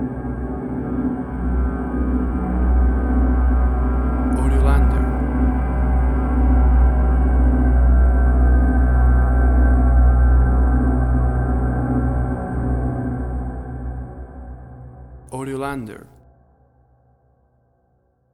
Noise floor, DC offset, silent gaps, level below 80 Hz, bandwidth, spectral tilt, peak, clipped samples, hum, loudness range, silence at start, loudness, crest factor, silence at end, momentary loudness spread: -62 dBFS; under 0.1%; none; -18 dBFS; 2.7 kHz; -9.5 dB/octave; -4 dBFS; under 0.1%; none; 16 LU; 0 s; -19 LUFS; 12 dB; 2.35 s; 14 LU